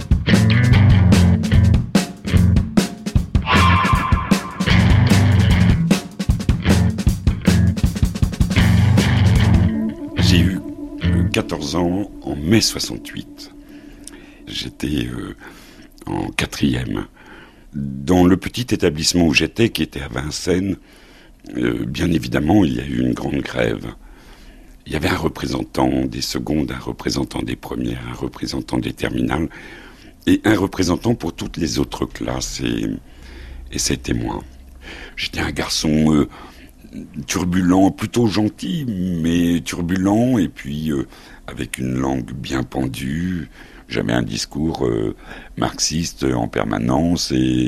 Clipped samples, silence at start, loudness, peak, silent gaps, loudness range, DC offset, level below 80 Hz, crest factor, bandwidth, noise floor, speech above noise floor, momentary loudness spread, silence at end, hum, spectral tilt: under 0.1%; 0 s; -19 LUFS; 0 dBFS; none; 8 LU; under 0.1%; -30 dBFS; 18 dB; 15.5 kHz; -42 dBFS; 22 dB; 15 LU; 0 s; none; -5.5 dB/octave